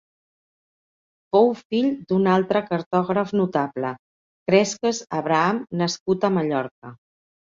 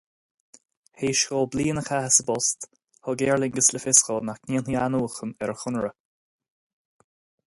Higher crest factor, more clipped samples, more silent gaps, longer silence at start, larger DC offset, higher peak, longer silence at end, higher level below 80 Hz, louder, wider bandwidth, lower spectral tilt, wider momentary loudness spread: about the same, 20 dB vs 24 dB; neither; first, 1.65-1.70 s, 2.86-2.91 s, 3.99-4.46 s, 6.00-6.06 s, 6.71-6.82 s vs none; first, 1.35 s vs 1 s; neither; about the same, -4 dBFS vs -2 dBFS; second, 0.65 s vs 1.55 s; second, -64 dBFS vs -58 dBFS; about the same, -22 LUFS vs -23 LUFS; second, 7.6 kHz vs 12 kHz; first, -5.5 dB/octave vs -3 dB/octave; second, 8 LU vs 13 LU